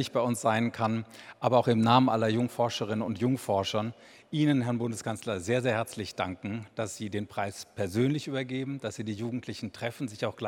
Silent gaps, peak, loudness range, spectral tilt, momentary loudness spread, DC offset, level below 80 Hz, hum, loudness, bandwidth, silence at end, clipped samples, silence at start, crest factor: none; -8 dBFS; 6 LU; -6 dB/octave; 11 LU; under 0.1%; -68 dBFS; none; -30 LUFS; 16.5 kHz; 0 s; under 0.1%; 0 s; 22 dB